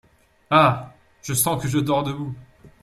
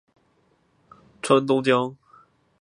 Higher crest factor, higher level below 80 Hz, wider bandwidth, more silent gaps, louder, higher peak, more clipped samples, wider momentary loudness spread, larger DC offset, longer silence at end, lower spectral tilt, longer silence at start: about the same, 20 dB vs 22 dB; first, -54 dBFS vs -70 dBFS; first, 15.5 kHz vs 11.5 kHz; neither; about the same, -21 LUFS vs -22 LUFS; about the same, -2 dBFS vs -4 dBFS; neither; first, 17 LU vs 13 LU; neither; second, 0.15 s vs 0.65 s; about the same, -4.5 dB/octave vs -5.5 dB/octave; second, 0.5 s vs 1.25 s